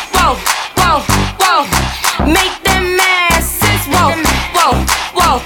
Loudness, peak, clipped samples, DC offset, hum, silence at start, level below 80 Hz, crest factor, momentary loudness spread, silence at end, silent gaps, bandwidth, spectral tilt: -11 LUFS; 0 dBFS; under 0.1%; under 0.1%; none; 0 s; -24 dBFS; 12 dB; 4 LU; 0 s; none; 20 kHz; -3 dB/octave